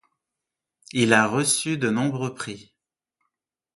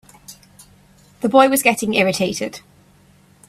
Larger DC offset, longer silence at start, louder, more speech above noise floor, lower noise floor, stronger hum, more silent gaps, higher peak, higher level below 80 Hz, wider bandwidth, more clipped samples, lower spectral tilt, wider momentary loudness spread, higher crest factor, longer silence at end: neither; first, 0.95 s vs 0.3 s; second, -22 LUFS vs -17 LUFS; first, 63 dB vs 35 dB; first, -86 dBFS vs -52 dBFS; neither; neither; about the same, 0 dBFS vs 0 dBFS; second, -66 dBFS vs -58 dBFS; second, 12 kHz vs 16 kHz; neither; about the same, -4 dB/octave vs -3.5 dB/octave; about the same, 16 LU vs 14 LU; first, 26 dB vs 20 dB; first, 1.15 s vs 0.9 s